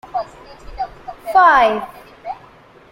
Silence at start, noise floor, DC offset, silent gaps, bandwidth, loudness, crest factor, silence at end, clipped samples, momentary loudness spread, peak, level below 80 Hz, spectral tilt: 0.15 s; -45 dBFS; under 0.1%; none; 16.5 kHz; -14 LUFS; 18 dB; 0.55 s; under 0.1%; 23 LU; 0 dBFS; -44 dBFS; -4 dB/octave